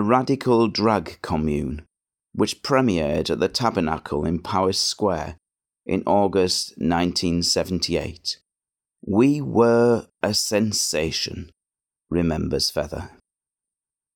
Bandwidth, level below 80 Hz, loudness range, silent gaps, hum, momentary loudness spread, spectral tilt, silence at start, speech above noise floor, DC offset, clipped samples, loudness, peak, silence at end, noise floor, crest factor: 17.5 kHz; -46 dBFS; 3 LU; none; none; 10 LU; -4.5 dB/octave; 0 s; over 68 dB; under 0.1%; under 0.1%; -22 LUFS; -4 dBFS; 1.1 s; under -90 dBFS; 18 dB